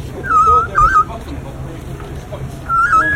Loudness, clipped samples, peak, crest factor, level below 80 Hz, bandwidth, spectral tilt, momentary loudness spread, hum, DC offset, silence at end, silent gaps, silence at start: -12 LUFS; under 0.1%; 0 dBFS; 14 dB; -30 dBFS; 15.5 kHz; -5.5 dB/octave; 18 LU; none; under 0.1%; 0 s; none; 0 s